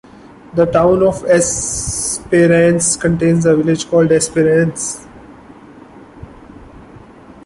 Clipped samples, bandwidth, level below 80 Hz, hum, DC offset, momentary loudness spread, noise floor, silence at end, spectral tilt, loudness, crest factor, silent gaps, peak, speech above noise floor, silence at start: under 0.1%; 11.5 kHz; -40 dBFS; none; under 0.1%; 7 LU; -39 dBFS; 0.15 s; -5 dB/octave; -13 LUFS; 14 dB; none; -2 dBFS; 27 dB; 0.55 s